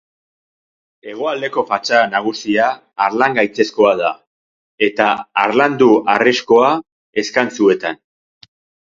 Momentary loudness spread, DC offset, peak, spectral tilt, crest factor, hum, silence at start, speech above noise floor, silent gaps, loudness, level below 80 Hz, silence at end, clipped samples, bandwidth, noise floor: 10 LU; under 0.1%; 0 dBFS; -4.5 dB/octave; 16 dB; none; 1.05 s; over 75 dB; 4.27-4.78 s, 6.92-7.13 s; -15 LUFS; -62 dBFS; 0.95 s; under 0.1%; 7.6 kHz; under -90 dBFS